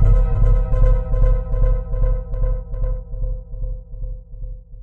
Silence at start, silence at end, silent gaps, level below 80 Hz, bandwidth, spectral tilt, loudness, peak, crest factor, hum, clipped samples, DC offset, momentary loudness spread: 0 s; 0 s; none; -18 dBFS; 2.2 kHz; -10.5 dB/octave; -22 LUFS; -4 dBFS; 14 dB; none; under 0.1%; under 0.1%; 15 LU